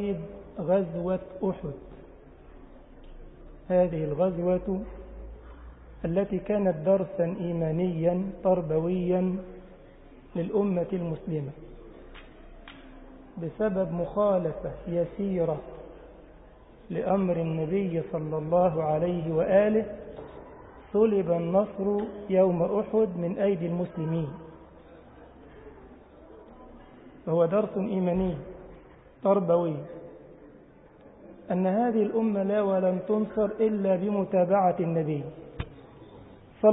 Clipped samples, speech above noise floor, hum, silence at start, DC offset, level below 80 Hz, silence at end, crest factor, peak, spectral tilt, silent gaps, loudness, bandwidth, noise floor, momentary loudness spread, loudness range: under 0.1%; 26 dB; none; 0 s; under 0.1%; -52 dBFS; 0 s; 20 dB; -8 dBFS; -12.5 dB/octave; none; -27 LUFS; 3.9 kHz; -53 dBFS; 21 LU; 7 LU